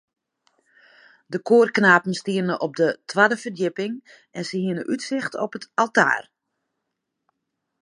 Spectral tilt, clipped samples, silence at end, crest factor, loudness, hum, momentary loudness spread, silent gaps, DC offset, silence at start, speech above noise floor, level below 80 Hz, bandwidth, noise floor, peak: -5 dB/octave; under 0.1%; 1.65 s; 22 dB; -21 LUFS; none; 14 LU; none; under 0.1%; 1.3 s; 58 dB; -76 dBFS; 11.5 kHz; -80 dBFS; 0 dBFS